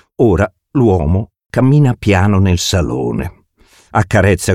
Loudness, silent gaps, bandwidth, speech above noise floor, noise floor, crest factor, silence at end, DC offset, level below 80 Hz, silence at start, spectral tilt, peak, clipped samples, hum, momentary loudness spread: -14 LUFS; none; 15.5 kHz; 38 dB; -49 dBFS; 12 dB; 0 s; under 0.1%; -30 dBFS; 0.2 s; -6 dB/octave; 0 dBFS; under 0.1%; none; 8 LU